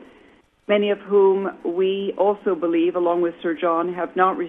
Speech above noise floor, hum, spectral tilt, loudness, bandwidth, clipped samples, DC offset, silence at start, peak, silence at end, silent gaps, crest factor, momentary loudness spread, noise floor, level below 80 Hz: 34 dB; none; -8.5 dB/octave; -21 LUFS; 3.8 kHz; under 0.1%; under 0.1%; 0 s; -4 dBFS; 0 s; none; 18 dB; 6 LU; -54 dBFS; -66 dBFS